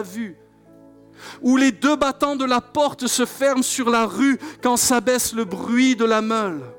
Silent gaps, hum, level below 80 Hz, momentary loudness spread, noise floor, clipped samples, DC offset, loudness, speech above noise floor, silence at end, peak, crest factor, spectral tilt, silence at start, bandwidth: none; none; -58 dBFS; 7 LU; -48 dBFS; under 0.1%; under 0.1%; -19 LUFS; 29 dB; 0 s; -8 dBFS; 12 dB; -3 dB/octave; 0 s; 18 kHz